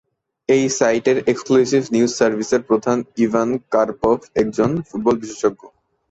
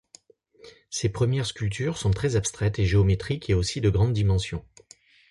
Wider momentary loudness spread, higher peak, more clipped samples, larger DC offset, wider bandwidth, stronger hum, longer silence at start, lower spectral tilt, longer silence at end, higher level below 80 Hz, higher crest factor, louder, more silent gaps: about the same, 5 LU vs 7 LU; first, -2 dBFS vs -10 dBFS; neither; neither; second, 8.2 kHz vs 11.5 kHz; neither; second, 0.5 s vs 0.65 s; about the same, -5 dB/octave vs -5.5 dB/octave; second, 0.45 s vs 0.7 s; second, -52 dBFS vs -38 dBFS; about the same, 16 dB vs 14 dB; first, -18 LUFS vs -25 LUFS; neither